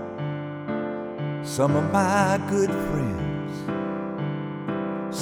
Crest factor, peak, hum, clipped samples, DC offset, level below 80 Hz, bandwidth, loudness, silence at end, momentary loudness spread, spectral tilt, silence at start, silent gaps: 18 dB; -8 dBFS; none; under 0.1%; under 0.1%; -50 dBFS; 16.5 kHz; -26 LUFS; 0 s; 10 LU; -6.5 dB/octave; 0 s; none